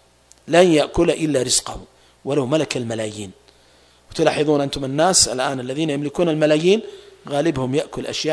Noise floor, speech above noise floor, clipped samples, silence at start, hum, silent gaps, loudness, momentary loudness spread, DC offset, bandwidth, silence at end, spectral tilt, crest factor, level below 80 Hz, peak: -53 dBFS; 34 dB; under 0.1%; 0.45 s; 60 Hz at -55 dBFS; none; -19 LUFS; 14 LU; under 0.1%; 11 kHz; 0 s; -4 dB/octave; 20 dB; -46 dBFS; 0 dBFS